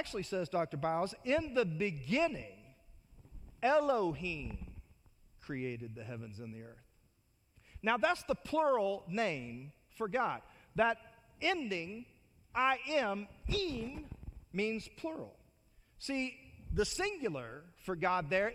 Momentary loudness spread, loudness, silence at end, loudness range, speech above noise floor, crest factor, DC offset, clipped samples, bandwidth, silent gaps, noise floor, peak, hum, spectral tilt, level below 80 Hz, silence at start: 16 LU; -36 LUFS; 0 s; 5 LU; 37 dB; 20 dB; under 0.1%; under 0.1%; 15.5 kHz; none; -72 dBFS; -18 dBFS; none; -5 dB/octave; -54 dBFS; 0 s